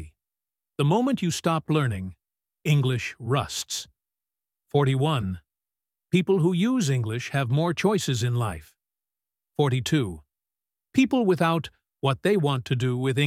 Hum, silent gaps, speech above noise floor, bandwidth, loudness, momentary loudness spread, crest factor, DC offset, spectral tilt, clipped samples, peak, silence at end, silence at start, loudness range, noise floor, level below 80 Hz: none; none; over 66 dB; 15.5 kHz; -25 LUFS; 11 LU; 18 dB; under 0.1%; -6 dB/octave; under 0.1%; -8 dBFS; 0 s; 0 s; 3 LU; under -90 dBFS; -56 dBFS